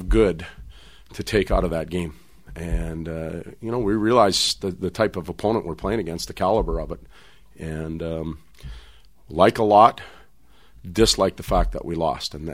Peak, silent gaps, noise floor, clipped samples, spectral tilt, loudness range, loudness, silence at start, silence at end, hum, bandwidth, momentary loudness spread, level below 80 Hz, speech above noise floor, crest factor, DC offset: 0 dBFS; none; -56 dBFS; under 0.1%; -5 dB/octave; 7 LU; -22 LUFS; 0 s; 0 s; none; 16 kHz; 19 LU; -34 dBFS; 34 dB; 22 dB; 0.4%